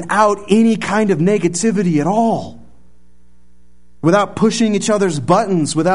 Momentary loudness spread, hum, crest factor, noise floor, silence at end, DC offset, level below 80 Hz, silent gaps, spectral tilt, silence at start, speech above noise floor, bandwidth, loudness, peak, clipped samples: 3 LU; none; 16 dB; -53 dBFS; 0 s; 1%; -50 dBFS; none; -5.5 dB/octave; 0 s; 39 dB; 11 kHz; -15 LUFS; 0 dBFS; under 0.1%